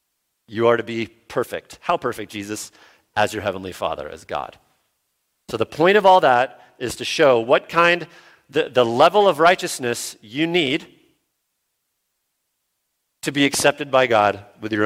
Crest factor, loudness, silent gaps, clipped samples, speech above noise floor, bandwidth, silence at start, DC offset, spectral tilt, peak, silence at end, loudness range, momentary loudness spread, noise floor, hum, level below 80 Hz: 20 dB; -19 LUFS; none; under 0.1%; 55 dB; 16.5 kHz; 0.5 s; under 0.1%; -4 dB/octave; -2 dBFS; 0 s; 9 LU; 15 LU; -75 dBFS; none; -58 dBFS